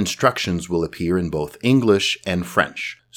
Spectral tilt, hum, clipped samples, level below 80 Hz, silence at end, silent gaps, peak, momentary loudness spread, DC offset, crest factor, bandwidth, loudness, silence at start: -5 dB/octave; none; under 0.1%; -46 dBFS; 0.2 s; none; 0 dBFS; 8 LU; under 0.1%; 20 dB; 18.5 kHz; -20 LUFS; 0 s